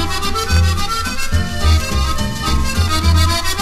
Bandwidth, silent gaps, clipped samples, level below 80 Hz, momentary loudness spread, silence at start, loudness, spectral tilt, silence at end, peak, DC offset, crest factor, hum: 15 kHz; none; under 0.1%; -20 dBFS; 5 LU; 0 s; -17 LUFS; -4 dB/octave; 0 s; -2 dBFS; under 0.1%; 14 dB; none